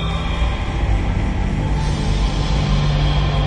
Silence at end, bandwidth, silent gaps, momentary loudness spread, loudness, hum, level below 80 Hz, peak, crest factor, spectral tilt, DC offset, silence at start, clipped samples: 0 s; 9.6 kHz; none; 4 LU; -20 LUFS; none; -20 dBFS; -6 dBFS; 12 dB; -6 dB/octave; under 0.1%; 0 s; under 0.1%